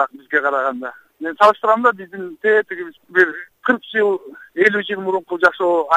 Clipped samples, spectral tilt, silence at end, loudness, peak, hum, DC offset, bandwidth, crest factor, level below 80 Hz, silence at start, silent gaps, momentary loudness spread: under 0.1%; -5 dB/octave; 0 s; -17 LUFS; 0 dBFS; none; under 0.1%; 15 kHz; 18 dB; -66 dBFS; 0 s; none; 15 LU